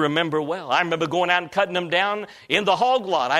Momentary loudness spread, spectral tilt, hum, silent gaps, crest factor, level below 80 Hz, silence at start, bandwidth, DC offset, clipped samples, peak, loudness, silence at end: 4 LU; -4.5 dB/octave; none; none; 20 dB; -66 dBFS; 0 s; 14 kHz; under 0.1%; under 0.1%; -2 dBFS; -22 LUFS; 0 s